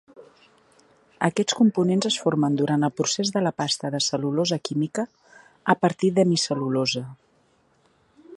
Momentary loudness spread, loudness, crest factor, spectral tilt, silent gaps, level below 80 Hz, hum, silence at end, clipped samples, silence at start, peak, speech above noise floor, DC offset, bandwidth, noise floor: 7 LU; -23 LUFS; 22 dB; -4.5 dB/octave; none; -68 dBFS; none; 0 s; under 0.1%; 0.2 s; -4 dBFS; 40 dB; under 0.1%; 11.5 kHz; -63 dBFS